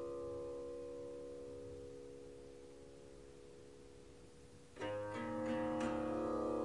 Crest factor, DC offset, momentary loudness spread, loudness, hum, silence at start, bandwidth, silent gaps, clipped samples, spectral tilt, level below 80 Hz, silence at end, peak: 16 dB; under 0.1%; 20 LU; -44 LUFS; none; 0 s; 11.5 kHz; none; under 0.1%; -6 dB/octave; -66 dBFS; 0 s; -28 dBFS